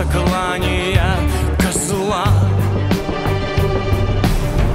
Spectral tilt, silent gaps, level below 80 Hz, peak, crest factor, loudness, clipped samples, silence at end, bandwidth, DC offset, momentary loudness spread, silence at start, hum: -5.5 dB/octave; none; -22 dBFS; -2 dBFS; 14 dB; -17 LUFS; under 0.1%; 0 s; 16 kHz; under 0.1%; 3 LU; 0 s; none